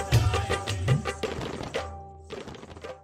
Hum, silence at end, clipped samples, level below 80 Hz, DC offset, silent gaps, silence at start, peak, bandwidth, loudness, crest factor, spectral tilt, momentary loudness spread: none; 0 s; under 0.1%; -40 dBFS; under 0.1%; none; 0 s; -10 dBFS; 16 kHz; -29 LUFS; 20 dB; -5.5 dB/octave; 17 LU